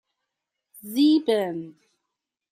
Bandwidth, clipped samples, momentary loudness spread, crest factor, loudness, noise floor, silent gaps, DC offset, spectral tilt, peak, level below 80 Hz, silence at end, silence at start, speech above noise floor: 15.5 kHz; under 0.1%; 23 LU; 16 dB; -22 LUFS; -84 dBFS; none; under 0.1%; -5 dB/octave; -10 dBFS; -78 dBFS; 0.8 s; 0.85 s; 62 dB